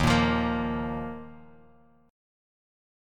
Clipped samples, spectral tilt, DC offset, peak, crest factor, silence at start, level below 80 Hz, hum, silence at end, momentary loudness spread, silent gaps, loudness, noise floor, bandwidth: under 0.1%; -6 dB/octave; under 0.1%; -10 dBFS; 20 dB; 0 s; -42 dBFS; none; 1.7 s; 19 LU; none; -28 LUFS; -59 dBFS; 14.5 kHz